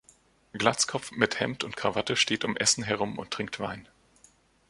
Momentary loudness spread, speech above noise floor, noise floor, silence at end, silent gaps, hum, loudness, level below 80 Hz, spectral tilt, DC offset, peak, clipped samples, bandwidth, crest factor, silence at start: 10 LU; 33 dB; -62 dBFS; 0.85 s; none; none; -28 LUFS; -62 dBFS; -2.5 dB/octave; under 0.1%; -4 dBFS; under 0.1%; 11.5 kHz; 28 dB; 0.55 s